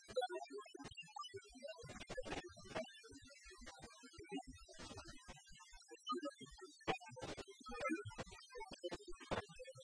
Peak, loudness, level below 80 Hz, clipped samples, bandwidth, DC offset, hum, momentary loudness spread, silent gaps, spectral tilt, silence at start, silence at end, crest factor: -26 dBFS; -51 LUFS; -66 dBFS; under 0.1%; 10.5 kHz; under 0.1%; none; 13 LU; none; -4 dB/octave; 0 s; 0 s; 24 dB